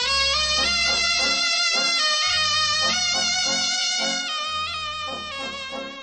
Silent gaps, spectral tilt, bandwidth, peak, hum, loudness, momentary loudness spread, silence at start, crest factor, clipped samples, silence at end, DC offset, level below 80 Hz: none; 0.5 dB/octave; 8.8 kHz; -8 dBFS; none; -20 LUFS; 11 LU; 0 s; 16 dB; under 0.1%; 0 s; under 0.1%; -48 dBFS